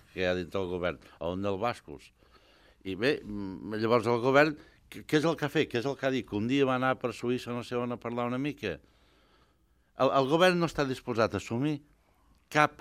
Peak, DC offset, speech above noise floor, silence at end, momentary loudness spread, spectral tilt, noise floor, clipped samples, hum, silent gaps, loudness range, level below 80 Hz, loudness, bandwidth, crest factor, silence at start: -6 dBFS; under 0.1%; 39 dB; 0.1 s; 14 LU; -6 dB/octave; -68 dBFS; under 0.1%; none; none; 6 LU; -62 dBFS; -30 LUFS; 15.5 kHz; 24 dB; 0.15 s